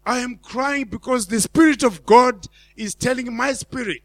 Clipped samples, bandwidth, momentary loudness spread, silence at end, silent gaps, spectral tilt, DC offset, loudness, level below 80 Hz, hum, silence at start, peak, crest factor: under 0.1%; 15.5 kHz; 13 LU; 0.05 s; none; -4 dB/octave; under 0.1%; -19 LUFS; -50 dBFS; none; 0.05 s; 0 dBFS; 20 dB